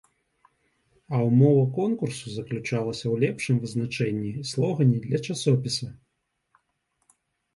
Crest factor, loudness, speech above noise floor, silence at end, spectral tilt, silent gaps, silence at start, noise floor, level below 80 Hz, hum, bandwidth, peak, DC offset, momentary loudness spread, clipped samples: 18 dB; -25 LUFS; 53 dB; 1.6 s; -6.5 dB/octave; none; 1.1 s; -77 dBFS; -62 dBFS; none; 11.5 kHz; -8 dBFS; under 0.1%; 11 LU; under 0.1%